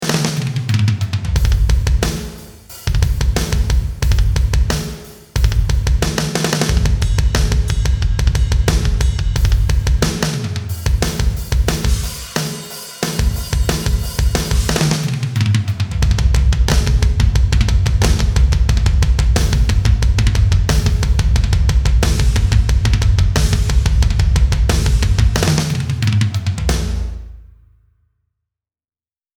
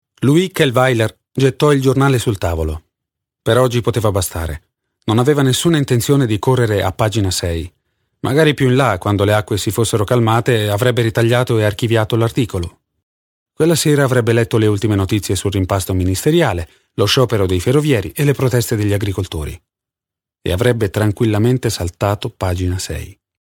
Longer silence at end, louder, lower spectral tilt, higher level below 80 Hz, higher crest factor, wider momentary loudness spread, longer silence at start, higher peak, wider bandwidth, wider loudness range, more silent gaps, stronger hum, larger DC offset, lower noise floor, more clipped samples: first, 1.95 s vs 0.35 s; about the same, -17 LUFS vs -16 LUFS; about the same, -5 dB/octave vs -5.5 dB/octave; first, -16 dBFS vs -38 dBFS; about the same, 14 dB vs 16 dB; second, 6 LU vs 9 LU; second, 0 s vs 0.2 s; about the same, 0 dBFS vs 0 dBFS; about the same, 18.5 kHz vs 18.5 kHz; about the same, 4 LU vs 3 LU; second, none vs 13.03-13.46 s; neither; neither; about the same, under -90 dBFS vs -87 dBFS; neither